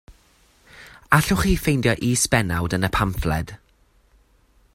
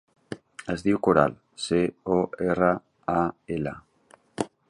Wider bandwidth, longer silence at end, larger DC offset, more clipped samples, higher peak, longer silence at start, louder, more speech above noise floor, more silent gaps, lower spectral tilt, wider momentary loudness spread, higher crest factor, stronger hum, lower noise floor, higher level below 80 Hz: first, 16 kHz vs 11 kHz; first, 1.2 s vs 0.25 s; neither; neither; first, 0 dBFS vs -4 dBFS; second, 0.1 s vs 0.3 s; first, -21 LUFS vs -26 LUFS; first, 39 dB vs 34 dB; neither; second, -4.5 dB/octave vs -6.5 dB/octave; second, 7 LU vs 19 LU; about the same, 22 dB vs 22 dB; neither; about the same, -59 dBFS vs -58 dBFS; first, -36 dBFS vs -54 dBFS